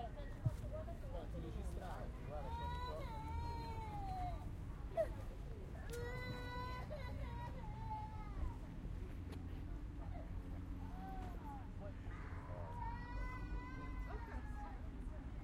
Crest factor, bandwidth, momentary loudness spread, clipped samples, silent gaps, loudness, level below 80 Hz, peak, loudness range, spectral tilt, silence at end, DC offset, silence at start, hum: 20 dB; 15.5 kHz; 6 LU; under 0.1%; none; -49 LUFS; -50 dBFS; -26 dBFS; 3 LU; -7 dB/octave; 0 s; under 0.1%; 0 s; none